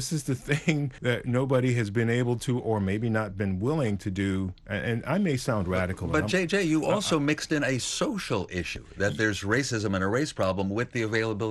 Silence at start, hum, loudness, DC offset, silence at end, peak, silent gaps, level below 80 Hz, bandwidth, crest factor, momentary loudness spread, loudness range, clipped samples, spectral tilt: 0 s; none; -27 LUFS; under 0.1%; 0 s; -10 dBFS; none; -52 dBFS; 12.5 kHz; 18 dB; 5 LU; 2 LU; under 0.1%; -5.5 dB/octave